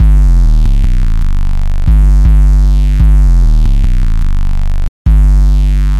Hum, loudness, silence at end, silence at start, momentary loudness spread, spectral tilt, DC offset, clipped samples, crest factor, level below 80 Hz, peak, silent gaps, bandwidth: none; -12 LUFS; 0 s; 0 s; 8 LU; -7.5 dB/octave; 1%; under 0.1%; 6 dB; -6 dBFS; -2 dBFS; 4.88-5.05 s; 5.8 kHz